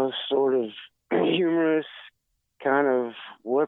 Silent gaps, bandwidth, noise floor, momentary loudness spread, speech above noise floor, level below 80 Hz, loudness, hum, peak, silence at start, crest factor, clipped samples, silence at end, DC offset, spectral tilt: none; 4.1 kHz; -76 dBFS; 17 LU; 52 dB; -80 dBFS; -25 LUFS; none; -10 dBFS; 0 s; 16 dB; under 0.1%; 0 s; under 0.1%; -8.5 dB/octave